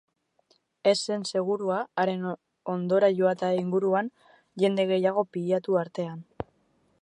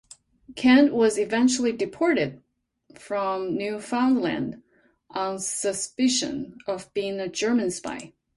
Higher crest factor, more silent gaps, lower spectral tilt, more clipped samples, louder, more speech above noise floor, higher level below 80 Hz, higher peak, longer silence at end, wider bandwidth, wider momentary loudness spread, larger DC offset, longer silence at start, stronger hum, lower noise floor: about the same, 18 dB vs 18 dB; neither; first, -5.5 dB/octave vs -3.5 dB/octave; neither; second, -27 LUFS vs -24 LUFS; first, 42 dB vs 36 dB; second, -68 dBFS vs -62 dBFS; second, -10 dBFS vs -6 dBFS; first, 0.6 s vs 0.3 s; about the same, 11 kHz vs 11.5 kHz; about the same, 14 LU vs 13 LU; neither; first, 0.85 s vs 0.5 s; neither; first, -68 dBFS vs -59 dBFS